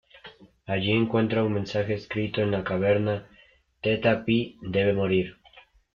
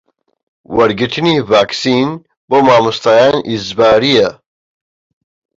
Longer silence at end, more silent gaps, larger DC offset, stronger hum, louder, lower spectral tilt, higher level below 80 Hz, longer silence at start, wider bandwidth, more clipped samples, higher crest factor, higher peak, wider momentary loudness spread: second, 0.35 s vs 1.25 s; second, none vs 2.37-2.48 s; neither; neither; second, -26 LUFS vs -12 LUFS; first, -8 dB/octave vs -5 dB/octave; second, -56 dBFS vs -48 dBFS; second, 0.15 s vs 0.7 s; second, 7 kHz vs 7.8 kHz; neither; first, 18 dB vs 12 dB; second, -10 dBFS vs 0 dBFS; about the same, 7 LU vs 9 LU